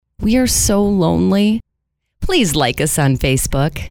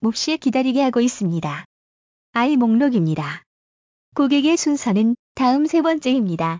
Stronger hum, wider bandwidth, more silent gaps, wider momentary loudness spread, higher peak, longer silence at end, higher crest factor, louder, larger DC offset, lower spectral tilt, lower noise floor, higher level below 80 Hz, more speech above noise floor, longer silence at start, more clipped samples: neither; first, 19 kHz vs 7.6 kHz; second, none vs 1.65-2.33 s, 3.46-4.12 s, 5.19-5.35 s; second, 5 LU vs 10 LU; first, -2 dBFS vs -6 dBFS; about the same, 0 s vs 0 s; about the same, 14 dB vs 12 dB; first, -15 LUFS vs -19 LUFS; neither; about the same, -4.5 dB/octave vs -5.5 dB/octave; second, -73 dBFS vs under -90 dBFS; first, -30 dBFS vs -60 dBFS; second, 58 dB vs over 72 dB; first, 0.2 s vs 0 s; neither